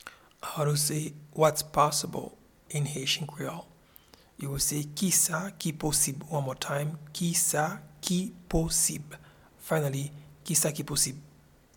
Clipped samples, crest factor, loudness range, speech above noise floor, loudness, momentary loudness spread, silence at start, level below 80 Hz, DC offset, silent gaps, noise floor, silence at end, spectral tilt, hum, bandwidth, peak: under 0.1%; 22 dB; 2 LU; 28 dB; -28 LUFS; 15 LU; 0.05 s; -50 dBFS; under 0.1%; none; -57 dBFS; 0.5 s; -3.5 dB/octave; none; 19 kHz; -8 dBFS